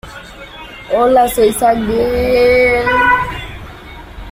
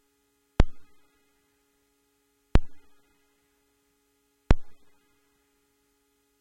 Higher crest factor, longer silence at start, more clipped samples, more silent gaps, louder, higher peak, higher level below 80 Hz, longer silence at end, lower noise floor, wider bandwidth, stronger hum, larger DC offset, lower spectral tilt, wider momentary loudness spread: second, 12 dB vs 26 dB; second, 0.05 s vs 0.6 s; neither; neither; first, -12 LUFS vs -30 LUFS; about the same, -2 dBFS vs -2 dBFS; about the same, -32 dBFS vs -32 dBFS; second, 0 s vs 1.65 s; second, -32 dBFS vs -71 dBFS; first, 16 kHz vs 8.2 kHz; neither; neither; second, -4.5 dB/octave vs -7.5 dB/octave; first, 22 LU vs 4 LU